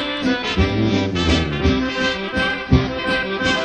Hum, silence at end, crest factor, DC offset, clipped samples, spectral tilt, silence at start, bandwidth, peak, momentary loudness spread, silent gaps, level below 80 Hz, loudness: none; 0 s; 18 dB; under 0.1%; under 0.1%; -5.5 dB/octave; 0 s; 9.8 kHz; 0 dBFS; 3 LU; none; -30 dBFS; -19 LUFS